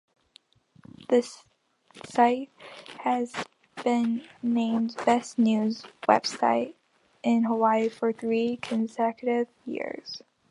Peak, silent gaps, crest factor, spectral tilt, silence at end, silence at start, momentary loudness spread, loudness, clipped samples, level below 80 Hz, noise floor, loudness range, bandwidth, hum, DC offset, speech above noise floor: -4 dBFS; none; 24 dB; -5 dB/octave; 0.3 s; 1 s; 15 LU; -27 LUFS; under 0.1%; -76 dBFS; -61 dBFS; 4 LU; 11 kHz; none; under 0.1%; 35 dB